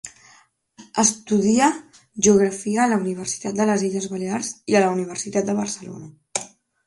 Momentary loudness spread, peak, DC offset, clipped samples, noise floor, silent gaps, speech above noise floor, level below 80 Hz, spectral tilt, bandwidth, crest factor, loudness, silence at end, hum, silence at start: 15 LU; -2 dBFS; under 0.1%; under 0.1%; -55 dBFS; none; 35 dB; -58 dBFS; -4 dB/octave; 11.5 kHz; 20 dB; -21 LUFS; 0.4 s; none; 0.05 s